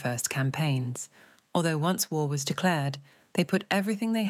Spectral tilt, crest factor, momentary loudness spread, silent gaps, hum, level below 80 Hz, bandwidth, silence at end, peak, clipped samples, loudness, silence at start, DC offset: -5 dB/octave; 18 dB; 8 LU; none; none; -74 dBFS; 16.5 kHz; 0 s; -10 dBFS; under 0.1%; -28 LUFS; 0 s; under 0.1%